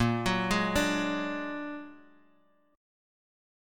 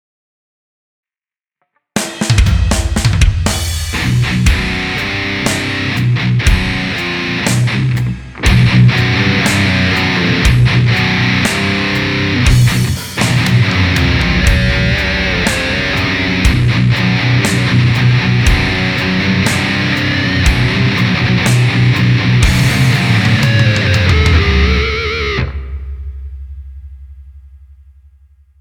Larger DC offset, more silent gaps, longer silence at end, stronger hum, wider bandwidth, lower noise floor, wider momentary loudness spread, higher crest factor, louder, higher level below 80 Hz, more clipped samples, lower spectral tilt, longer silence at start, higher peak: neither; neither; about the same, 1.05 s vs 0.95 s; neither; about the same, 17.5 kHz vs 17.5 kHz; second, -67 dBFS vs under -90 dBFS; first, 14 LU vs 6 LU; first, 20 dB vs 12 dB; second, -30 LUFS vs -12 LUFS; second, -50 dBFS vs -20 dBFS; neither; about the same, -5 dB/octave vs -5 dB/octave; second, 0 s vs 1.95 s; second, -14 dBFS vs 0 dBFS